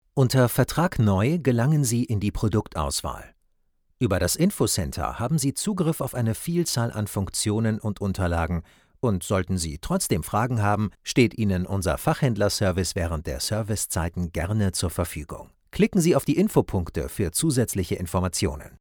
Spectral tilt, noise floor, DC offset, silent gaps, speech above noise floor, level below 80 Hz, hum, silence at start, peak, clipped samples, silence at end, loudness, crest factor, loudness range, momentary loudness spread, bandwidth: -5.5 dB/octave; -67 dBFS; under 0.1%; none; 43 dB; -42 dBFS; none; 0.15 s; -6 dBFS; under 0.1%; 0.05 s; -24 LUFS; 18 dB; 2 LU; 7 LU; over 20 kHz